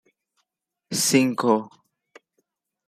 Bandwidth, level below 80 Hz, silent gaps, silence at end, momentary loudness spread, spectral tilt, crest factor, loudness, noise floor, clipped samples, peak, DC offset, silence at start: 15.5 kHz; -70 dBFS; none; 1.2 s; 6 LU; -3.5 dB/octave; 22 dB; -21 LUFS; -79 dBFS; under 0.1%; -4 dBFS; under 0.1%; 0.9 s